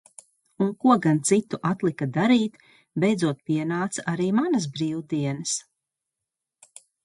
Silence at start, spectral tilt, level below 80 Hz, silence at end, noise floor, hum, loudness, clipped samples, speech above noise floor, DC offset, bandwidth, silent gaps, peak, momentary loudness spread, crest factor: 0.6 s; -5.5 dB/octave; -68 dBFS; 1.45 s; -86 dBFS; none; -24 LUFS; under 0.1%; 62 dB; under 0.1%; 11.5 kHz; none; -6 dBFS; 8 LU; 20 dB